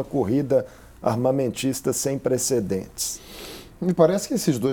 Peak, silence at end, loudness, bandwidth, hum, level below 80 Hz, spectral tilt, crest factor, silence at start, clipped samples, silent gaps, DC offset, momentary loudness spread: -4 dBFS; 0 s; -23 LUFS; 19.5 kHz; none; -52 dBFS; -5 dB/octave; 20 dB; 0 s; under 0.1%; none; under 0.1%; 13 LU